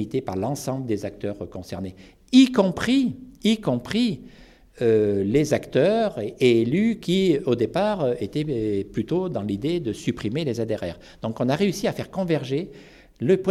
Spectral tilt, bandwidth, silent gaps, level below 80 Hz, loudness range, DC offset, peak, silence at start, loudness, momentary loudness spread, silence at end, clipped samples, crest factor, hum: -6.5 dB/octave; 13.5 kHz; none; -52 dBFS; 5 LU; under 0.1%; -4 dBFS; 0 s; -23 LUFS; 12 LU; 0 s; under 0.1%; 20 dB; none